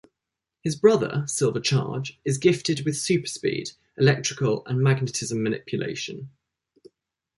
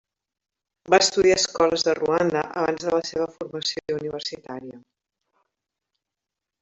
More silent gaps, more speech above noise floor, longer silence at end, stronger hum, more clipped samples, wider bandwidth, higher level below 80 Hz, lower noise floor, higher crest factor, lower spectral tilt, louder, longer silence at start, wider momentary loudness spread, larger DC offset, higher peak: neither; about the same, 62 dB vs 64 dB; second, 1.1 s vs 1.85 s; neither; neither; first, 11.5 kHz vs 8.2 kHz; about the same, -62 dBFS vs -60 dBFS; about the same, -86 dBFS vs -86 dBFS; about the same, 20 dB vs 22 dB; first, -5 dB/octave vs -3 dB/octave; about the same, -24 LUFS vs -22 LUFS; second, 0.65 s vs 0.9 s; second, 11 LU vs 14 LU; neither; about the same, -4 dBFS vs -4 dBFS